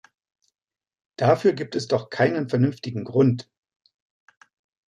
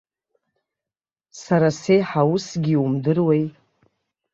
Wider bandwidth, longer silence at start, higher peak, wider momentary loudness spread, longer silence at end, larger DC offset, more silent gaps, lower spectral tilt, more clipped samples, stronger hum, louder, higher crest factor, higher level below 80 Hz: first, 10.5 kHz vs 7.8 kHz; second, 1.2 s vs 1.35 s; about the same, -4 dBFS vs -6 dBFS; first, 8 LU vs 5 LU; first, 1.45 s vs 0.85 s; neither; neither; about the same, -7 dB/octave vs -7 dB/octave; neither; neither; second, -23 LUFS vs -20 LUFS; about the same, 20 dB vs 16 dB; second, -68 dBFS vs -62 dBFS